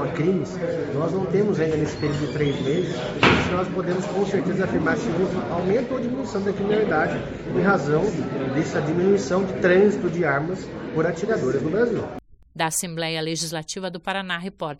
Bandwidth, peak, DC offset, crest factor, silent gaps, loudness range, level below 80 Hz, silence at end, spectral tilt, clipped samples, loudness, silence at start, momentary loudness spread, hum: 12.5 kHz; -4 dBFS; under 0.1%; 20 dB; none; 3 LU; -48 dBFS; 0.05 s; -5.5 dB/octave; under 0.1%; -23 LUFS; 0 s; 8 LU; none